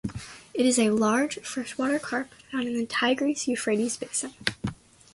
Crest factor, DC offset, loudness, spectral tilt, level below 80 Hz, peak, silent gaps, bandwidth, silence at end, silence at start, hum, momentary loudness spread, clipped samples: 22 dB; under 0.1%; -27 LUFS; -3.5 dB/octave; -56 dBFS; -4 dBFS; none; 11.5 kHz; 0.4 s; 0.05 s; none; 12 LU; under 0.1%